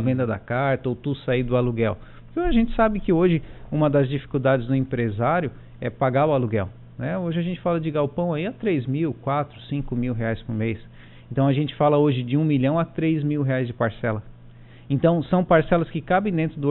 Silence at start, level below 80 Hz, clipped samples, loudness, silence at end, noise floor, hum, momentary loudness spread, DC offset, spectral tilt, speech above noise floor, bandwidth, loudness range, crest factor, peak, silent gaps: 0 s; -40 dBFS; under 0.1%; -23 LUFS; 0 s; -45 dBFS; none; 8 LU; under 0.1%; -7 dB/octave; 23 dB; 4.2 kHz; 3 LU; 16 dB; -6 dBFS; none